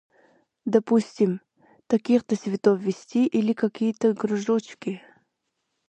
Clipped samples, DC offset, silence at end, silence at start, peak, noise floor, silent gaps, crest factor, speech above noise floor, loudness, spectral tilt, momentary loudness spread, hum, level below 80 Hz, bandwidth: under 0.1%; under 0.1%; 0.9 s; 0.65 s; -4 dBFS; -78 dBFS; none; 20 dB; 55 dB; -24 LUFS; -7 dB/octave; 12 LU; none; -72 dBFS; 8.8 kHz